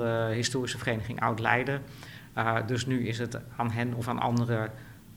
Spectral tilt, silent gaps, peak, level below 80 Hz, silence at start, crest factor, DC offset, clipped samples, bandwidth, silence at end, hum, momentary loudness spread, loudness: -5.5 dB/octave; none; -8 dBFS; -58 dBFS; 0 s; 22 dB; under 0.1%; under 0.1%; 16 kHz; 0 s; none; 10 LU; -30 LUFS